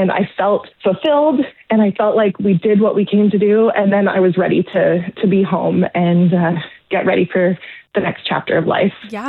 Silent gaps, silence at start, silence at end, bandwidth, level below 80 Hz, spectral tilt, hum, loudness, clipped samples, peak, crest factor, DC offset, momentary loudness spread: none; 0 s; 0 s; 4.3 kHz; -58 dBFS; -9.5 dB/octave; none; -15 LUFS; under 0.1%; -6 dBFS; 10 dB; under 0.1%; 6 LU